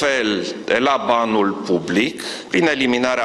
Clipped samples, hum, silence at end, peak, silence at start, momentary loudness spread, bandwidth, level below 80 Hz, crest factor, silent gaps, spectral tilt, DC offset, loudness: under 0.1%; none; 0 s; -2 dBFS; 0 s; 5 LU; 12.5 kHz; -56 dBFS; 16 dB; none; -4 dB/octave; under 0.1%; -18 LUFS